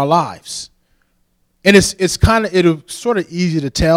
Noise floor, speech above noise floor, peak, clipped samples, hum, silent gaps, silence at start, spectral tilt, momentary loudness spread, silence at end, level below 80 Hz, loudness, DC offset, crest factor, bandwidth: -61 dBFS; 47 dB; 0 dBFS; under 0.1%; none; none; 0 s; -5 dB/octave; 16 LU; 0 s; -30 dBFS; -15 LUFS; under 0.1%; 16 dB; 16 kHz